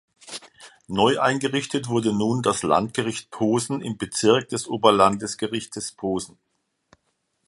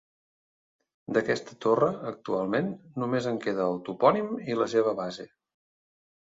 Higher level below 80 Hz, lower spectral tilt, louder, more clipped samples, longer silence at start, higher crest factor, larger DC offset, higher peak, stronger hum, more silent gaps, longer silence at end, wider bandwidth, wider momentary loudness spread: first, -58 dBFS vs -70 dBFS; second, -4.5 dB/octave vs -6.5 dB/octave; first, -23 LUFS vs -28 LUFS; neither; second, 0.25 s vs 1.1 s; about the same, 22 dB vs 22 dB; neither; first, -2 dBFS vs -6 dBFS; neither; neither; first, 1.2 s vs 1.05 s; first, 11.5 kHz vs 7.8 kHz; about the same, 11 LU vs 11 LU